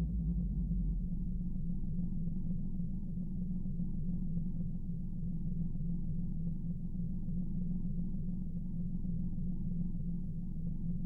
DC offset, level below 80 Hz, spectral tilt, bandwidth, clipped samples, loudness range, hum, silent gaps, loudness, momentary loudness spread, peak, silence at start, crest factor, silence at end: under 0.1%; -38 dBFS; -13 dB/octave; 1 kHz; under 0.1%; 1 LU; none; none; -40 LUFS; 4 LU; -26 dBFS; 0 s; 10 dB; 0 s